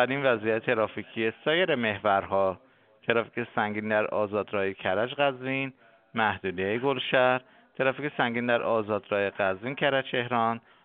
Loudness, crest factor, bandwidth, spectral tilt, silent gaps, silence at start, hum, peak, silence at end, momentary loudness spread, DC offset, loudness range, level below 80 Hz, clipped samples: -27 LUFS; 22 dB; 4.5 kHz; -3 dB/octave; none; 0 s; none; -6 dBFS; 0.25 s; 6 LU; under 0.1%; 2 LU; -70 dBFS; under 0.1%